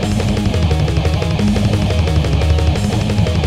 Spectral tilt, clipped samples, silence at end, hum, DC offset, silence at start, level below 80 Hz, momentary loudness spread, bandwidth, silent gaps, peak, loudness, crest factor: -6.5 dB/octave; under 0.1%; 0 s; none; 0.2%; 0 s; -20 dBFS; 2 LU; 13 kHz; none; -2 dBFS; -16 LUFS; 12 dB